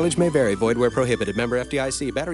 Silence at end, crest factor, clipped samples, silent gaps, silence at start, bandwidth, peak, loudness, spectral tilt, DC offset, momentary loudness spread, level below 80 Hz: 0 s; 14 dB; under 0.1%; none; 0 s; 11.5 kHz; -6 dBFS; -22 LUFS; -5 dB/octave; under 0.1%; 5 LU; -44 dBFS